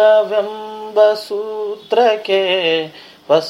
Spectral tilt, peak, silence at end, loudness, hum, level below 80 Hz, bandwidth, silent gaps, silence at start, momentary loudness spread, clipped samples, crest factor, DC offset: -4 dB/octave; 0 dBFS; 0 s; -16 LUFS; none; -74 dBFS; 12.5 kHz; none; 0 s; 11 LU; under 0.1%; 16 dB; under 0.1%